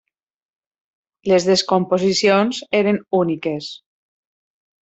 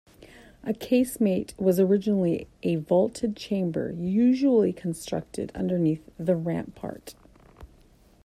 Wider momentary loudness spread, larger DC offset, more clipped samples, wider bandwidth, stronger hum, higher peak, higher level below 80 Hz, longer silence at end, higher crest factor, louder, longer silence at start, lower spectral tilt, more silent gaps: about the same, 11 LU vs 12 LU; neither; neither; second, 8.2 kHz vs 14.5 kHz; neither; first, -4 dBFS vs -10 dBFS; second, -62 dBFS vs -56 dBFS; first, 1.05 s vs 0.6 s; about the same, 18 dB vs 16 dB; first, -18 LUFS vs -26 LUFS; first, 1.25 s vs 0.2 s; second, -4.5 dB/octave vs -7.5 dB/octave; neither